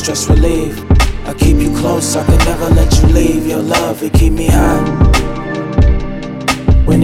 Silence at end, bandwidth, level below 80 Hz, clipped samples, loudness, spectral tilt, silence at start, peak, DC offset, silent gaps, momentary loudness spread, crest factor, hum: 0 s; 16 kHz; -14 dBFS; under 0.1%; -13 LUFS; -5.5 dB/octave; 0 s; 0 dBFS; under 0.1%; none; 6 LU; 10 dB; none